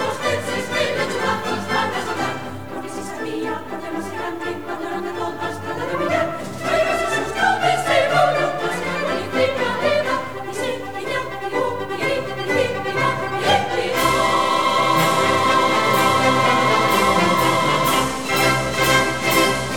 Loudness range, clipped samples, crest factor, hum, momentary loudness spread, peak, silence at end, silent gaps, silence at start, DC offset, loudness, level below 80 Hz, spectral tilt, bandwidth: 9 LU; under 0.1%; 16 dB; none; 11 LU; -4 dBFS; 0 s; none; 0 s; 1%; -19 LUFS; -48 dBFS; -3.5 dB/octave; 19.5 kHz